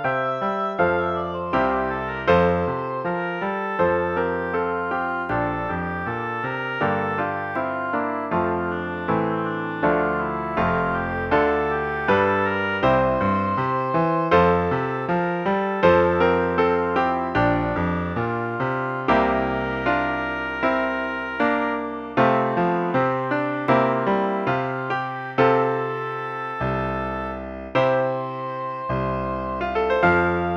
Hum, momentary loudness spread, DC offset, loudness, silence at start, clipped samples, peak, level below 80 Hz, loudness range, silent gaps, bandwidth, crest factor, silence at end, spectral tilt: none; 8 LU; under 0.1%; -22 LUFS; 0 s; under 0.1%; -4 dBFS; -46 dBFS; 4 LU; none; 7 kHz; 18 dB; 0 s; -8 dB/octave